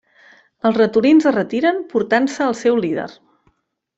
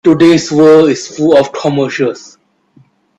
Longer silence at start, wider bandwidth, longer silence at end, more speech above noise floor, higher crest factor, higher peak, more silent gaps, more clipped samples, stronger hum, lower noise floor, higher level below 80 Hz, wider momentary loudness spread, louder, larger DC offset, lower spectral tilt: first, 0.65 s vs 0.05 s; about the same, 8 kHz vs 8.8 kHz; second, 0.85 s vs 1 s; first, 47 dB vs 39 dB; first, 16 dB vs 10 dB; about the same, -2 dBFS vs 0 dBFS; neither; neither; neither; first, -63 dBFS vs -48 dBFS; second, -62 dBFS vs -52 dBFS; about the same, 9 LU vs 10 LU; second, -17 LUFS vs -10 LUFS; neither; about the same, -5.5 dB/octave vs -5.5 dB/octave